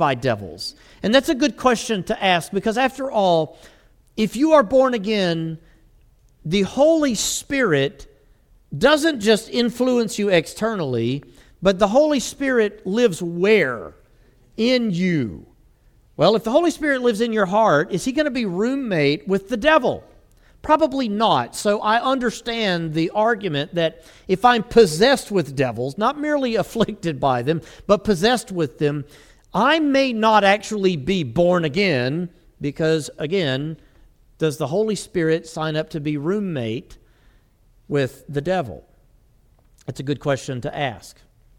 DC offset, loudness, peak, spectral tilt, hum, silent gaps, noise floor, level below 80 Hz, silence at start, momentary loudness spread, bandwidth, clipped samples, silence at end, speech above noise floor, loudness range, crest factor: under 0.1%; -20 LUFS; -2 dBFS; -5 dB/octave; none; none; -56 dBFS; -50 dBFS; 0 s; 11 LU; 16.5 kHz; under 0.1%; 0.5 s; 36 dB; 6 LU; 20 dB